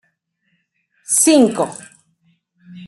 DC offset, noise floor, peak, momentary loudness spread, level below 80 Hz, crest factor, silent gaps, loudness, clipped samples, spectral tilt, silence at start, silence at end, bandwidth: under 0.1%; -67 dBFS; 0 dBFS; 14 LU; -66 dBFS; 18 dB; none; -14 LUFS; under 0.1%; -3 dB/octave; 1.1 s; 0 s; 12.5 kHz